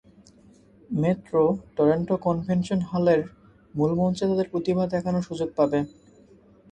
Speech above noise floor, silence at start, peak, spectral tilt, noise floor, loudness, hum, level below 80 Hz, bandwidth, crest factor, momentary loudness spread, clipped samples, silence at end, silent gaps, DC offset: 31 dB; 0.9 s; -8 dBFS; -8 dB/octave; -54 dBFS; -25 LUFS; none; -56 dBFS; 9 kHz; 18 dB; 6 LU; under 0.1%; 0.85 s; none; under 0.1%